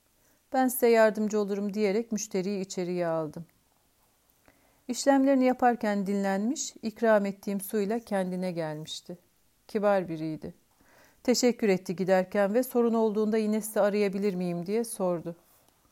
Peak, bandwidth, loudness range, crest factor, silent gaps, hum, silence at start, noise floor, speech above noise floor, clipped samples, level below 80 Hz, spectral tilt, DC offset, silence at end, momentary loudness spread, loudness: -12 dBFS; 16 kHz; 5 LU; 18 dB; none; none; 0.5 s; -68 dBFS; 41 dB; under 0.1%; -70 dBFS; -5 dB/octave; under 0.1%; 0.6 s; 11 LU; -28 LUFS